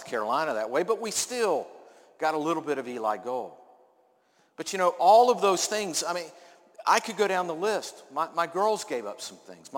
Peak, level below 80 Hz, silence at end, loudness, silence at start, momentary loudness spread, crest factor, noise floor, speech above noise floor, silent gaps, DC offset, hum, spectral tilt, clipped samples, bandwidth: -8 dBFS; -78 dBFS; 0 s; -27 LUFS; 0 s; 13 LU; 20 dB; -66 dBFS; 39 dB; none; under 0.1%; none; -2.5 dB/octave; under 0.1%; 17 kHz